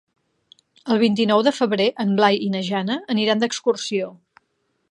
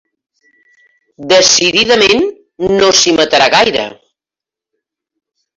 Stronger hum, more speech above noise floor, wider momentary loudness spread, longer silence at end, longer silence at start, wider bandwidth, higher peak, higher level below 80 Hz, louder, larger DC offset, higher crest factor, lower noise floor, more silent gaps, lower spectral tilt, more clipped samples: neither; second, 51 dB vs 77 dB; second, 7 LU vs 12 LU; second, 0.8 s vs 1.65 s; second, 0.85 s vs 1.2 s; first, 11 kHz vs 8.2 kHz; about the same, -2 dBFS vs 0 dBFS; second, -70 dBFS vs -48 dBFS; second, -20 LUFS vs -9 LUFS; neither; first, 20 dB vs 14 dB; second, -70 dBFS vs -87 dBFS; neither; first, -5 dB/octave vs -1.5 dB/octave; neither